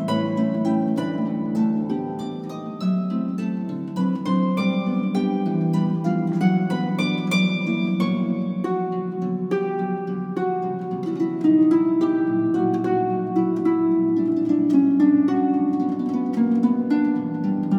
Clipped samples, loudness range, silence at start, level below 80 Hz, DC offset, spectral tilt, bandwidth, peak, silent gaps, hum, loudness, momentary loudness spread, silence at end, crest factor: under 0.1%; 5 LU; 0 s; -68 dBFS; under 0.1%; -8 dB/octave; 9.8 kHz; -6 dBFS; none; none; -22 LUFS; 8 LU; 0 s; 14 dB